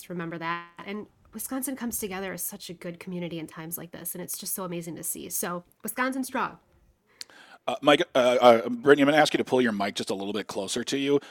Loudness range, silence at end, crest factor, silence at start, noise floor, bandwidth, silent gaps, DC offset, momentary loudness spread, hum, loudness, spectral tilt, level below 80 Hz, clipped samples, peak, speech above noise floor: 11 LU; 0 s; 22 dB; 0 s; -63 dBFS; 19 kHz; none; under 0.1%; 18 LU; none; -26 LUFS; -3.5 dB/octave; -68 dBFS; under 0.1%; -4 dBFS; 36 dB